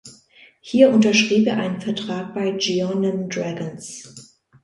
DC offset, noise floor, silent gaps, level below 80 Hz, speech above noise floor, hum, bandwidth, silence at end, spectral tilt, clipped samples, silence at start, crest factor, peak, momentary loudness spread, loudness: under 0.1%; -51 dBFS; none; -64 dBFS; 32 dB; none; 11.5 kHz; 0.4 s; -5 dB/octave; under 0.1%; 0.05 s; 20 dB; -2 dBFS; 16 LU; -20 LUFS